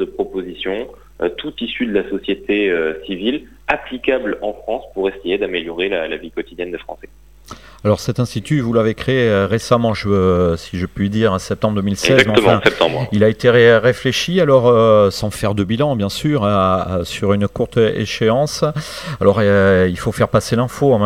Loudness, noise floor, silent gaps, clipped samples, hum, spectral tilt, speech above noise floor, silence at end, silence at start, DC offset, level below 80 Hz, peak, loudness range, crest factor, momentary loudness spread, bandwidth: -16 LUFS; -39 dBFS; none; under 0.1%; none; -6 dB/octave; 23 dB; 0 s; 0 s; 0.4%; -42 dBFS; 0 dBFS; 8 LU; 16 dB; 12 LU; 16 kHz